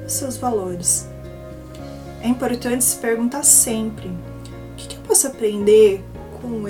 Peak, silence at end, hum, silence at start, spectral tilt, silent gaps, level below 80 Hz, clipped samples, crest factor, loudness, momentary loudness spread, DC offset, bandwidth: 0 dBFS; 0 s; none; 0 s; -3 dB/octave; none; -42 dBFS; under 0.1%; 20 dB; -17 LUFS; 23 LU; under 0.1%; 19 kHz